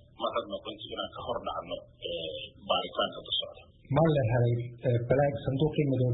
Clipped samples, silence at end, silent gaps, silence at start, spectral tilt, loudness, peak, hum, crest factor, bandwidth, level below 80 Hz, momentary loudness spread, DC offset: under 0.1%; 0 s; none; 0.2 s; -10.5 dB/octave; -30 LUFS; -10 dBFS; none; 20 dB; 4.1 kHz; -54 dBFS; 12 LU; under 0.1%